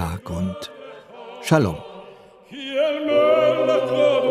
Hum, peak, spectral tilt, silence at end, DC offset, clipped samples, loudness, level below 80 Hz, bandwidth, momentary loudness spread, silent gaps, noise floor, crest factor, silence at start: none; -4 dBFS; -6 dB/octave; 0 s; under 0.1%; under 0.1%; -20 LUFS; -52 dBFS; 14.5 kHz; 23 LU; none; -45 dBFS; 18 dB; 0 s